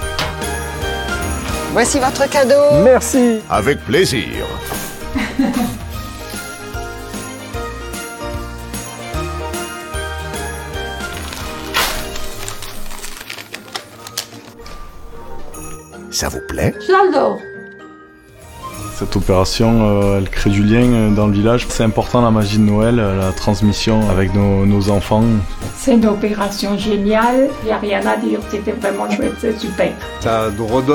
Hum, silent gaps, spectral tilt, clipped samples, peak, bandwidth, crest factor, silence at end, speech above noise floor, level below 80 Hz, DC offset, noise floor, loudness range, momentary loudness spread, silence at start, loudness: none; none; -5.5 dB/octave; under 0.1%; 0 dBFS; 18 kHz; 16 dB; 0 s; 27 dB; -30 dBFS; under 0.1%; -41 dBFS; 12 LU; 16 LU; 0 s; -16 LUFS